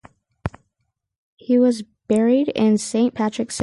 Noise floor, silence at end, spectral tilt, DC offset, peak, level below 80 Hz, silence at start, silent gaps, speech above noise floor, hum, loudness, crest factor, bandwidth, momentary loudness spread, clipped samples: -75 dBFS; 0 s; -5.5 dB/octave; under 0.1%; -6 dBFS; -50 dBFS; 0.45 s; 1.18-1.37 s; 57 dB; none; -19 LUFS; 14 dB; 11.5 kHz; 15 LU; under 0.1%